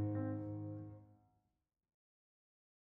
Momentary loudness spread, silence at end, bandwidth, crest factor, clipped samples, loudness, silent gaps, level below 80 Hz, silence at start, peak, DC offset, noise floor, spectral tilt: 15 LU; 1.8 s; 2.5 kHz; 16 dB; under 0.1%; -45 LUFS; none; -76 dBFS; 0 s; -32 dBFS; under 0.1%; -83 dBFS; -9.5 dB/octave